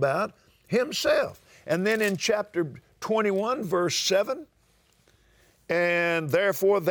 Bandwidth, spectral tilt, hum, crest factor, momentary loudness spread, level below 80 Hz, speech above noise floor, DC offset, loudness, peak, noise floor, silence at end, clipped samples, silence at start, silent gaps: over 20 kHz; -4 dB/octave; none; 14 dB; 10 LU; -66 dBFS; 39 dB; under 0.1%; -26 LUFS; -12 dBFS; -64 dBFS; 0 s; under 0.1%; 0 s; none